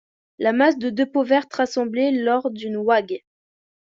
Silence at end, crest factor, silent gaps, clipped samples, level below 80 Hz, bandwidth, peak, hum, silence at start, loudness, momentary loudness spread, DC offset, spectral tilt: 0.8 s; 18 dB; none; under 0.1%; -68 dBFS; 7.6 kHz; -4 dBFS; none; 0.4 s; -21 LUFS; 7 LU; under 0.1%; -5 dB/octave